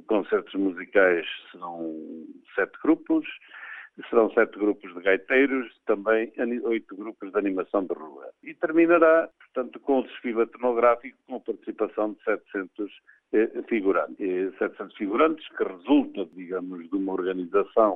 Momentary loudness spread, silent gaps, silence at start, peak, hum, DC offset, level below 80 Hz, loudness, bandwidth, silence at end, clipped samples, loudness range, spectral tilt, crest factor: 16 LU; none; 0.1 s; -6 dBFS; none; under 0.1%; -68 dBFS; -25 LUFS; 3.9 kHz; 0 s; under 0.1%; 4 LU; -8 dB/octave; 20 dB